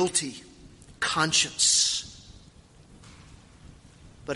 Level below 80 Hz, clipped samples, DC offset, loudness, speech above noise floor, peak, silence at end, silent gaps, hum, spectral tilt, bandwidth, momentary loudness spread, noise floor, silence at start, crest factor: -56 dBFS; under 0.1%; under 0.1%; -23 LUFS; 28 dB; -8 dBFS; 0 s; none; none; -1 dB/octave; 11.5 kHz; 24 LU; -53 dBFS; 0 s; 22 dB